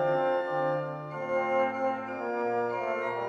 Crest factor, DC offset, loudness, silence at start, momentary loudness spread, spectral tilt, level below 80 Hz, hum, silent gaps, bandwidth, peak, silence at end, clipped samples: 14 dB; under 0.1%; -30 LUFS; 0 s; 6 LU; -7 dB/octave; -74 dBFS; none; none; 7.6 kHz; -14 dBFS; 0 s; under 0.1%